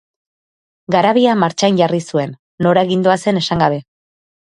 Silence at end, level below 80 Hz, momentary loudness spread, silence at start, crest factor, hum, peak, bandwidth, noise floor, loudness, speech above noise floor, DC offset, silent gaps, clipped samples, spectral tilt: 0.8 s; -52 dBFS; 8 LU; 0.9 s; 16 dB; none; 0 dBFS; 11 kHz; under -90 dBFS; -15 LUFS; over 76 dB; under 0.1%; 2.39-2.58 s; under 0.1%; -5.5 dB/octave